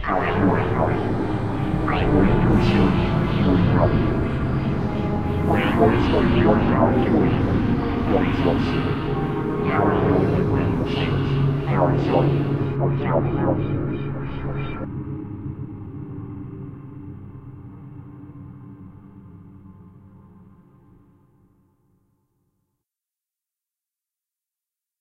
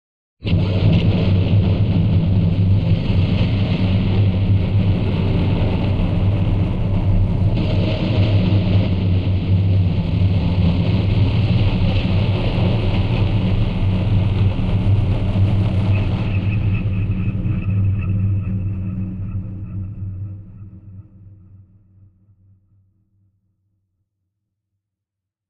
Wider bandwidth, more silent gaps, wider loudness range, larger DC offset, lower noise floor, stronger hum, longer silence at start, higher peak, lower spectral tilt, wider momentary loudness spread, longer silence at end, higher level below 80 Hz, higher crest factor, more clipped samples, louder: first, 6.8 kHz vs 5 kHz; neither; first, 18 LU vs 8 LU; neither; first, -89 dBFS vs -84 dBFS; neither; second, 0 s vs 0.4 s; about the same, -4 dBFS vs -6 dBFS; about the same, -9 dB/octave vs -9.5 dB/octave; first, 20 LU vs 8 LU; second, 0 s vs 4.15 s; second, -34 dBFS vs -26 dBFS; first, 18 dB vs 12 dB; neither; second, -21 LUFS vs -18 LUFS